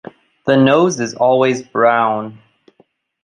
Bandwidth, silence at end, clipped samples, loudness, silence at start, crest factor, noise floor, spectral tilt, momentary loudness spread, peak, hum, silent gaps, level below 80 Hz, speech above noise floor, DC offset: 10 kHz; 0.9 s; under 0.1%; -14 LUFS; 0.45 s; 14 dB; -56 dBFS; -5.5 dB/octave; 11 LU; -2 dBFS; none; none; -62 dBFS; 43 dB; under 0.1%